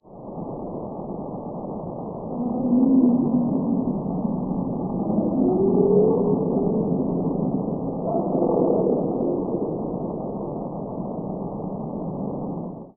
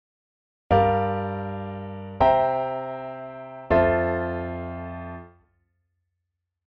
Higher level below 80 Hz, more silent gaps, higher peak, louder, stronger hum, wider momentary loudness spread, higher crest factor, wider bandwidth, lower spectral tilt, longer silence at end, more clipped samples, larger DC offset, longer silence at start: about the same, -48 dBFS vs -44 dBFS; neither; about the same, -6 dBFS vs -8 dBFS; about the same, -24 LUFS vs -24 LUFS; neither; second, 14 LU vs 17 LU; about the same, 16 dB vs 18 dB; second, 1.4 kHz vs 5.4 kHz; second, -4.5 dB/octave vs -9.5 dB/octave; second, 0.05 s vs 1.4 s; neither; neither; second, 0.05 s vs 0.7 s